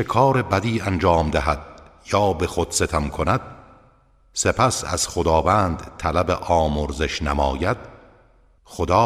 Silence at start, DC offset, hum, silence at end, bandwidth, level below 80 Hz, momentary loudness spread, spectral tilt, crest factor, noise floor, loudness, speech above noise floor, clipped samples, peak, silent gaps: 0 s; under 0.1%; none; 0 s; 15.5 kHz; -34 dBFS; 7 LU; -5 dB/octave; 18 dB; -56 dBFS; -21 LUFS; 35 dB; under 0.1%; -4 dBFS; none